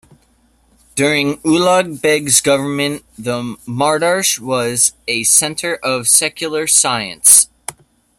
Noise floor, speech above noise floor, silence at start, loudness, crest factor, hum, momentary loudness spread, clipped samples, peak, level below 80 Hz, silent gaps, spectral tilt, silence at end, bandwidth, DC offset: -55 dBFS; 40 dB; 0.95 s; -13 LUFS; 16 dB; none; 12 LU; 0.1%; 0 dBFS; -54 dBFS; none; -2 dB/octave; 0.45 s; over 20 kHz; under 0.1%